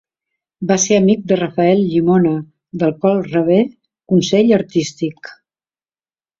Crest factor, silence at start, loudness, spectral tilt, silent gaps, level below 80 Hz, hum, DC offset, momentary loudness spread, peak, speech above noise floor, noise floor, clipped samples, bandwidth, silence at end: 14 dB; 0.6 s; -15 LUFS; -5.5 dB/octave; none; -56 dBFS; none; under 0.1%; 12 LU; -2 dBFS; over 76 dB; under -90 dBFS; under 0.1%; 7.8 kHz; 1.1 s